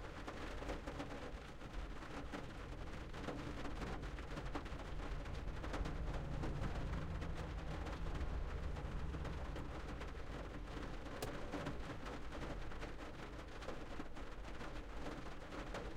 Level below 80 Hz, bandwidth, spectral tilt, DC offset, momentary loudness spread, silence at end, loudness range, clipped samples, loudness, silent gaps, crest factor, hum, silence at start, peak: -50 dBFS; 16 kHz; -6 dB/octave; under 0.1%; 6 LU; 0 s; 4 LU; under 0.1%; -48 LUFS; none; 16 dB; none; 0 s; -30 dBFS